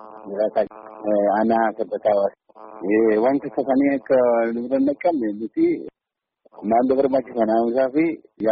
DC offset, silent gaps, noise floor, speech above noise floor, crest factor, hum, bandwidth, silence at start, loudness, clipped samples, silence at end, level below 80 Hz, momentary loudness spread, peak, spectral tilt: under 0.1%; none; -85 dBFS; 65 dB; 12 dB; none; 5 kHz; 0 s; -21 LUFS; under 0.1%; 0 s; -62 dBFS; 8 LU; -8 dBFS; -6 dB/octave